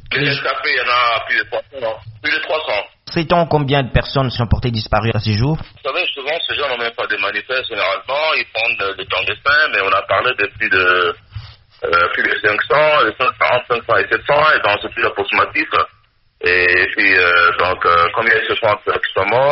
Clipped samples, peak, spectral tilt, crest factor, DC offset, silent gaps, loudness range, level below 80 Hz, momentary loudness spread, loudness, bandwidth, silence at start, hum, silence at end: under 0.1%; 0 dBFS; -2 dB/octave; 16 dB; under 0.1%; none; 5 LU; -38 dBFS; 8 LU; -15 LUFS; 6 kHz; 0.05 s; none; 0 s